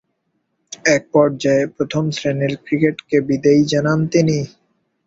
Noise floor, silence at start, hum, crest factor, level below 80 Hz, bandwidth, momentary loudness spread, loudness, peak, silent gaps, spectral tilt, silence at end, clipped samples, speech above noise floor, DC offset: -70 dBFS; 0.7 s; none; 16 dB; -54 dBFS; 7.8 kHz; 6 LU; -17 LUFS; 0 dBFS; none; -6 dB/octave; 0.6 s; under 0.1%; 53 dB; under 0.1%